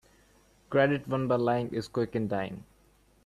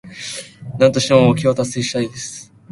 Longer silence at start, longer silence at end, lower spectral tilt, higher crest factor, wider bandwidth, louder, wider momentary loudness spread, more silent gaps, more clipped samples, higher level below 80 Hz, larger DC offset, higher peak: first, 0.7 s vs 0.05 s; first, 0.65 s vs 0.3 s; first, -7.5 dB/octave vs -5 dB/octave; about the same, 20 dB vs 18 dB; first, 13.5 kHz vs 11.5 kHz; second, -29 LUFS vs -16 LUFS; second, 8 LU vs 17 LU; neither; neither; second, -62 dBFS vs -50 dBFS; neither; second, -10 dBFS vs 0 dBFS